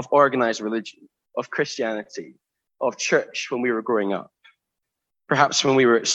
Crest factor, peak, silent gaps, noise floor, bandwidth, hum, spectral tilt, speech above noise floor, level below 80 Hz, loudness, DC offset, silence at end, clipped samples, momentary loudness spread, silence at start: 22 dB; -2 dBFS; none; -82 dBFS; 8.4 kHz; none; -3.5 dB/octave; 61 dB; -72 dBFS; -22 LUFS; under 0.1%; 0 s; under 0.1%; 14 LU; 0 s